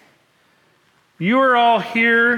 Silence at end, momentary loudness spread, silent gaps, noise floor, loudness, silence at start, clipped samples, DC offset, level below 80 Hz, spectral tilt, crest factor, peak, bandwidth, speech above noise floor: 0 s; 5 LU; none; -59 dBFS; -15 LUFS; 1.2 s; under 0.1%; under 0.1%; -66 dBFS; -6 dB/octave; 12 dB; -6 dBFS; 12.5 kHz; 44 dB